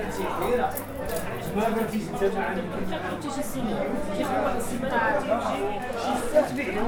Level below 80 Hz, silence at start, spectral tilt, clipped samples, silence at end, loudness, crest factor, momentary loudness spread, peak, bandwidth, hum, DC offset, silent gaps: -44 dBFS; 0 s; -5 dB/octave; under 0.1%; 0 s; -27 LUFS; 18 dB; 7 LU; -8 dBFS; over 20 kHz; none; under 0.1%; none